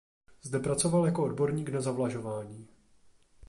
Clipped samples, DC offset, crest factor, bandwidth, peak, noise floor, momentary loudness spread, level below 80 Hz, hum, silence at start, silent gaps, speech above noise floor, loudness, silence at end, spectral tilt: under 0.1%; under 0.1%; 16 dB; 11.5 kHz; -14 dBFS; -61 dBFS; 17 LU; -60 dBFS; none; 0.45 s; none; 31 dB; -31 LUFS; 0.05 s; -6 dB/octave